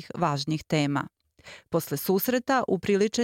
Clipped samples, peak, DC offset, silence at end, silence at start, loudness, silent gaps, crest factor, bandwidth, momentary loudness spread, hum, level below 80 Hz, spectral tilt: under 0.1%; -12 dBFS; under 0.1%; 0 s; 0 s; -27 LUFS; none; 14 dB; 17 kHz; 7 LU; none; -62 dBFS; -5.5 dB/octave